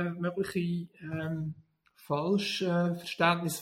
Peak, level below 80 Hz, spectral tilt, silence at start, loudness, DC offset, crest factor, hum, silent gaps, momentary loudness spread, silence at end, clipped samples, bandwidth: -12 dBFS; -68 dBFS; -5.5 dB/octave; 0 s; -31 LUFS; under 0.1%; 20 dB; none; none; 10 LU; 0 s; under 0.1%; 15.5 kHz